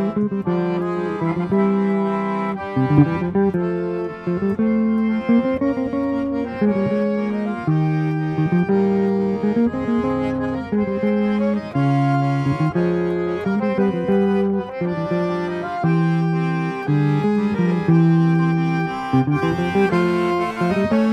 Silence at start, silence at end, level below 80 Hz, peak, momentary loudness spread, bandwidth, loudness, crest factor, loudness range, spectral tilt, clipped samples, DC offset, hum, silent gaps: 0 s; 0 s; -50 dBFS; -2 dBFS; 5 LU; 8.4 kHz; -20 LUFS; 16 dB; 2 LU; -9 dB/octave; under 0.1%; under 0.1%; none; none